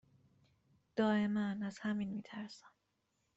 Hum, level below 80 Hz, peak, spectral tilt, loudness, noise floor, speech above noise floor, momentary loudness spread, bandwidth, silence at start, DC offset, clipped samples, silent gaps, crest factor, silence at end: none; -78 dBFS; -22 dBFS; -7 dB/octave; -38 LUFS; -82 dBFS; 45 dB; 15 LU; 8 kHz; 0.95 s; under 0.1%; under 0.1%; none; 18 dB; 0.7 s